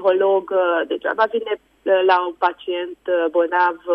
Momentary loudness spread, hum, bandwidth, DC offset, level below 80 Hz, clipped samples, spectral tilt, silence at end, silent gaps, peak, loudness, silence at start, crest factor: 10 LU; none; 5.8 kHz; under 0.1%; -66 dBFS; under 0.1%; -5.5 dB/octave; 0 s; none; -4 dBFS; -19 LUFS; 0 s; 14 dB